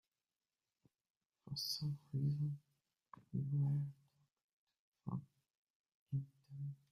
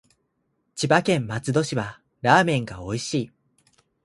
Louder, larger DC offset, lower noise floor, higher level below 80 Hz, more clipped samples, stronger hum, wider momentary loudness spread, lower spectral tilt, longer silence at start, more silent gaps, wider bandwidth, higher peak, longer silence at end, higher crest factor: second, -43 LUFS vs -23 LUFS; neither; first, under -90 dBFS vs -73 dBFS; second, -78 dBFS vs -56 dBFS; neither; neither; about the same, 11 LU vs 13 LU; first, -6.5 dB/octave vs -5 dB/octave; first, 1.45 s vs 0.75 s; first, 4.43-4.67 s, 4.79-4.92 s, 5.57-5.84 s, 5.94-6.06 s vs none; first, 15 kHz vs 11.5 kHz; second, -30 dBFS vs -2 dBFS; second, 0.15 s vs 0.75 s; second, 16 dB vs 24 dB